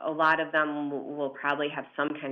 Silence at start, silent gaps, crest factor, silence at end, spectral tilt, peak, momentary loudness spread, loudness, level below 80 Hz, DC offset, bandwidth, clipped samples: 0 s; none; 18 dB; 0 s; -6.5 dB/octave; -10 dBFS; 9 LU; -29 LUFS; -78 dBFS; under 0.1%; 6.8 kHz; under 0.1%